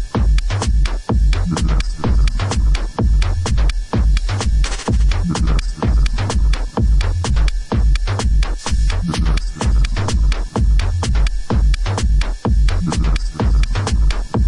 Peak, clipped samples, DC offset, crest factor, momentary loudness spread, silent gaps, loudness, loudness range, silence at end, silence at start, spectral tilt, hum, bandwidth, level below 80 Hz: -4 dBFS; under 0.1%; under 0.1%; 12 dB; 2 LU; none; -19 LUFS; 1 LU; 0 s; 0 s; -5.5 dB/octave; none; 11 kHz; -16 dBFS